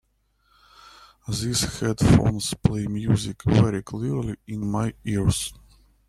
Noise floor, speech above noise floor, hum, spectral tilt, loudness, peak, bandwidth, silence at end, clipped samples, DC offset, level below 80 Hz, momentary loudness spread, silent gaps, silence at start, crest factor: -67 dBFS; 44 dB; none; -5.5 dB/octave; -24 LUFS; -2 dBFS; 14.5 kHz; 0.55 s; under 0.1%; under 0.1%; -40 dBFS; 11 LU; none; 1.3 s; 22 dB